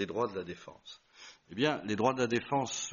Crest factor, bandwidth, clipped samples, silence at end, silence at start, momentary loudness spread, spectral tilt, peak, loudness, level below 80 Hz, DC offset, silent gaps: 20 dB; 7.2 kHz; under 0.1%; 0 s; 0 s; 21 LU; -3.5 dB/octave; -14 dBFS; -32 LUFS; -70 dBFS; under 0.1%; none